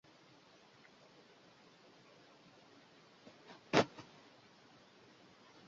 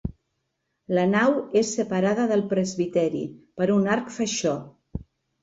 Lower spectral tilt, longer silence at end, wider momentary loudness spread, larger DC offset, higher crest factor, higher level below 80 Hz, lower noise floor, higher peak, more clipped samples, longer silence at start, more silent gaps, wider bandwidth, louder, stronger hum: second, -3 dB/octave vs -5.5 dB/octave; first, 1.65 s vs 0.4 s; first, 28 LU vs 15 LU; neither; first, 34 dB vs 16 dB; second, -80 dBFS vs -50 dBFS; second, -64 dBFS vs -77 dBFS; about the same, -10 dBFS vs -10 dBFS; neither; first, 3.75 s vs 0.05 s; neither; about the same, 7.4 kHz vs 8 kHz; second, -35 LUFS vs -24 LUFS; neither